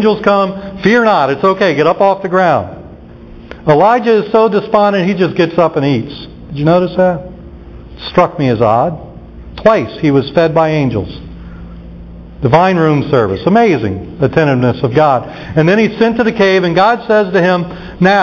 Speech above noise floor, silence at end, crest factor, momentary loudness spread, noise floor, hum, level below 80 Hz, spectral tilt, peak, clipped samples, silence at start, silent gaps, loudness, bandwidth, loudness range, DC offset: 22 dB; 0 s; 12 dB; 16 LU; -33 dBFS; none; -38 dBFS; -7.5 dB/octave; 0 dBFS; under 0.1%; 0 s; none; -11 LUFS; 7.2 kHz; 3 LU; under 0.1%